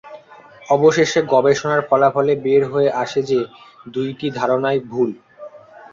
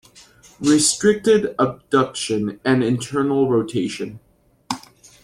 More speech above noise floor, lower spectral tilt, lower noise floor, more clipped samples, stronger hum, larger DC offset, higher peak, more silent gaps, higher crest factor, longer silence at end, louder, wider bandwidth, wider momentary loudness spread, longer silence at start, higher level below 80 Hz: second, 26 dB vs 30 dB; about the same, -5.5 dB/octave vs -4.5 dB/octave; second, -43 dBFS vs -49 dBFS; neither; neither; neither; about the same, -2 dBFS vs -4 dBFS; neither; about the same, 16 dB vs 16 dB; second, 0.15 s vs 0.45 s; about the same, -17 LUFS vs -19 LUFS; second, 7.6 kHz vs 13.5 kHz; second, 10 LU vs 15 LU; second, 0.05 s vs 0.6 s; about the same, -60 dBFS vs -56 dBFS